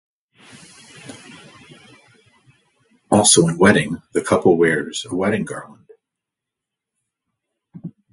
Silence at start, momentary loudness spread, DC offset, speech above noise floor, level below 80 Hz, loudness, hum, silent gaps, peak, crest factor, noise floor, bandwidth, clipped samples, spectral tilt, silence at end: 1.05 s; 26 LU; under 0.1%; 67 dB; -54 dBFS; -16 LUFS; none; none; 0 dBFS; 22 dB; -84 dBFS; 11.5 kHz; under 0.1%; -4 dB/octave; 0.25 s